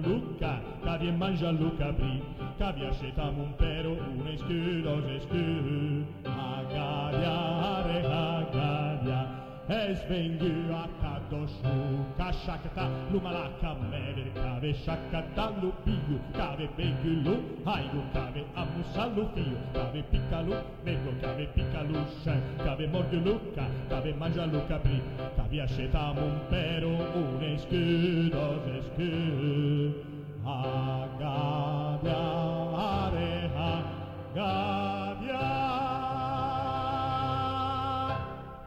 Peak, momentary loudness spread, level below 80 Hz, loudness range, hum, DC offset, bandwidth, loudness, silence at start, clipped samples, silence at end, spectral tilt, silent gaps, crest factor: -14 dBFS; 6 LU; -40 dBFS; 3 LU; none; under 0.1%; 7.4 kHz; -32 LUFS; 0 s; under 0.1%; 0 s; -8.5 dB/octave; none; 18 dB